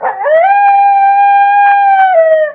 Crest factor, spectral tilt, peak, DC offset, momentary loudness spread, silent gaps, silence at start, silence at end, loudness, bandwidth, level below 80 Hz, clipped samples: 8 dB; -3.5 dB/octave; 0 dBFS; under 0.1%; 1 LU; none; 0 s; 0 s; -7 LUFS; 4.3 kHz; -68 dBFS; under 0.1%